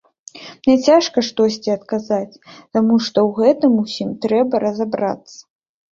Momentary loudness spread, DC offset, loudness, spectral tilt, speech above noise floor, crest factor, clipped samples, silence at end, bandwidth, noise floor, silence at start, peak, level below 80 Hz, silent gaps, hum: 10 LU; under 0.1%; -17 LUFS; -5.5 dB/octave; 22 dB; 16 dB; under 0.1%; 0.5 s; 7.6 kHz; -39 dBFS; 0.35 s; -2 dBFS; -58 dBFS; none; none